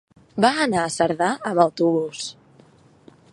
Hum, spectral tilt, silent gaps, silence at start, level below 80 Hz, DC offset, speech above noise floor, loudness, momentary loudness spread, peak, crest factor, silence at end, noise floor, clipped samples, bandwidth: none; -4.5 dB/octave; none; 0.35 s; -62 dBFS; under 0.1%; 32 dB; -21 LUFS; 13 LU; -2 dBFS; 22 dB; 1 s; -53 dBFS; under 0.1%; 11.5 kHz